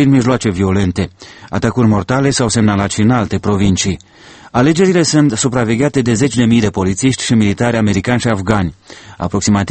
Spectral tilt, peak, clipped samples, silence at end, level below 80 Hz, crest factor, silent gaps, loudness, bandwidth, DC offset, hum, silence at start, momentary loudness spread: -5.5 dB/octave; 0 dBFS; under 0.1%; 0 s; -38 dBFS; 14 dB; none; -14 LUFS; 8.8 kHz; under 0.1%; none; 0 s; 7 LU